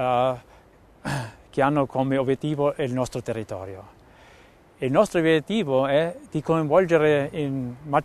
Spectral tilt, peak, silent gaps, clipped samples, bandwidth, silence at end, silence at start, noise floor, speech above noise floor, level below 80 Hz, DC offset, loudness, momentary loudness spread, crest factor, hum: -6.5 dB/octave; -4 dBFS; none; under 0.1%; 13.5 kHz; 0 s; 0 s; -53 dBFS; 30 dB; -54 dBFS; under 0.1%; -23 LUFS; 12 LU; 18 dB; none